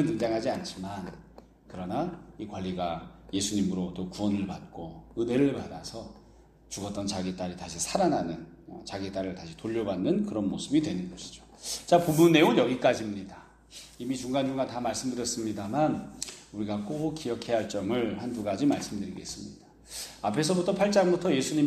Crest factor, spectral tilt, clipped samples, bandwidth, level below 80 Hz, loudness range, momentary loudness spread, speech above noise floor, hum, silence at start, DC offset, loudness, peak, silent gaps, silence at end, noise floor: 22 dB; -5 dB/octave; under 0.1%; 15.5 kHz; -58 dBFS; 7 LU; 17 LU; 27 dB; none; 0 s; under 0.1%; -29 LUFS; -8 dBFS; none; 0 s; -56 dBFS